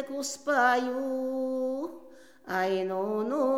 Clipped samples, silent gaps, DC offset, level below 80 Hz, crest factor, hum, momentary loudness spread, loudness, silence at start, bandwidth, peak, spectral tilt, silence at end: under 0.1%; none; 0.1%; -78 dBFS; 18 dB; none; 10 LU; -29 LUFS; 0 s; 16.5 kHz; -12 dBFS; -4 dB/octave; 0 s